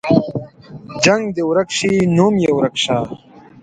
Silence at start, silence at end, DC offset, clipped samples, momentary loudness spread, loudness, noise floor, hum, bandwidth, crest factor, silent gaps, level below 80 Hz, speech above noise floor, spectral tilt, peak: 0.05 s; 0.25 s; under 0.1%; under 0.1%; 15 LU; -16 LUFS; -35 dBFS; none; 9.6 kHz; 16 dB; none; -52 dBFS; 20 dB; -5 dB/octave; 0 dBFS